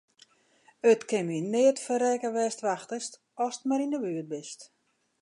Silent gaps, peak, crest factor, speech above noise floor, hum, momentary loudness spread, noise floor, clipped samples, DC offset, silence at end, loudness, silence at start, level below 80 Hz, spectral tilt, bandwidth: none; -12 dBFS; 18 dB; 36 dB; none; 14 LU; -64 dBFS; under 0.1%; under 0.1%; 0.55 s; -28 LUFS; 0.85 s; -84 dBFS; -4.5 dB/octave; 11.5 kHz